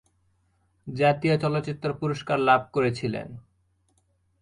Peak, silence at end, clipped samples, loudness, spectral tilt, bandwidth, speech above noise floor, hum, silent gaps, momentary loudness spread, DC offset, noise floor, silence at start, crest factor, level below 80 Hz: -6 dBFS; 1.05 s; under 0.1%; -25 LUFS; -7 dB/octave; 11.5 kHz; 44 dB; none; none; 15 LU; under 0.1%; -68 dBFS; 0.85 s; 22 dB; -60 dBFS